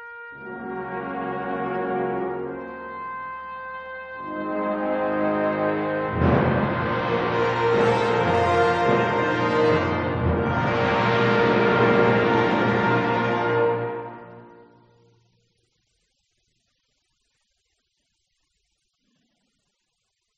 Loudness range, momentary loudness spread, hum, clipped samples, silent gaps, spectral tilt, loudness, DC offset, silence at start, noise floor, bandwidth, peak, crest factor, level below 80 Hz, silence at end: 9 LU; 15 LU; none; under 0.1%; none; -7.5 dB/octave; -22 LUFS; under 0.1%; 0 s; -76 dBFS; 8.8 kHz; -4 dBFS; 20 dB; -48 dBFS; 5.85 s